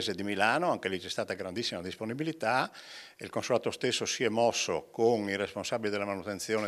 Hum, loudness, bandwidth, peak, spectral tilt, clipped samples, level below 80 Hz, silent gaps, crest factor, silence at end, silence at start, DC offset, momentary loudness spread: none; -31 LUFS; 15 kHz; -10 dBFS; -3.5 dB/octave; under 0.1%; -78 dBFS; none; 22 dB; 0 s; 0 s; under 0.1%; 10 LU